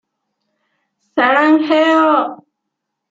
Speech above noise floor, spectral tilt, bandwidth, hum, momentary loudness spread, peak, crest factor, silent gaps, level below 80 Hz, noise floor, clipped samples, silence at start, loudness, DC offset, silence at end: 64 dB; -4.5 dB/octave; 7.6 kHz; none; 10 LU; -2 dBFS; 16 dB; none; -68 dBFS; -76 dBFS; under 0.1%; 1.15 s; -13 LUFS; under 0.1%; 0.75 s